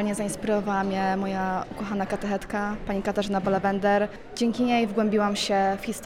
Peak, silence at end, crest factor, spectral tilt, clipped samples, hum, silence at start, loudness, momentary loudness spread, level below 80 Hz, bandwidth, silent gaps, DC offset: -10 dBFS; 0 s; 16 dB; -5 dB/octave; under 0.1%; none; 0 s; -26 LUFS; 6 LU; -48 dBFS; 15.5 kHz; none; under 0.1%